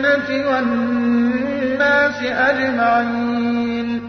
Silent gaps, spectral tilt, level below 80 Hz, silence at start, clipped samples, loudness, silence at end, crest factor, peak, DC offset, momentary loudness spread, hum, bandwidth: none; -6 dB/octave; -54 dBFS; 0 s; under 0.1%; -17 LUFS; 0 s; 12 dB; -4 dBFS; under 0.1%; 5 LU; none; 6.4 kHz